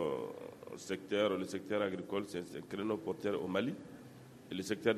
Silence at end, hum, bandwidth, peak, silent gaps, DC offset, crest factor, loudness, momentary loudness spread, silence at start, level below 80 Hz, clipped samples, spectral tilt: 0 s; none; 13.5 kHz; -18 dBFS; none; under 0.1%; 20 dB; -38 LUFS; 15 LU; 0 s; -76 dBFS; under 0.1%; -5 dB/octave